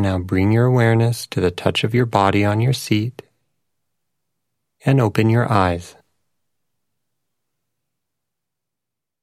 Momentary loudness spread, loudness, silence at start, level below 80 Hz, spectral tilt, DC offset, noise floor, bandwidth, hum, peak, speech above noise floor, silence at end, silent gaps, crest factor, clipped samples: 6 LU; -18 LUFS; 0 s; -52 dBFS; -6.5 dB/octave; under 0.1%; -86 dBFS; 14.5 kHz; none; 0 dBFS; 69 dB; 3.35 s; none; 20 dB; under 0.1%